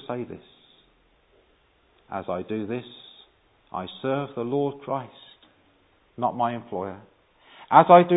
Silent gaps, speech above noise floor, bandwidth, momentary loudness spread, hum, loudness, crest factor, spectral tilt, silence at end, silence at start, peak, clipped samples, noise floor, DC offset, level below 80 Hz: none; 40 dB; 4 kHz; 22 LU; none; -25 LUFS; 24 dB; -11 dB/octave; 0 s; 0.1 s; 0 dBFS; under 0.1%; -63 dBFS; under 0.1%; -64 dBFS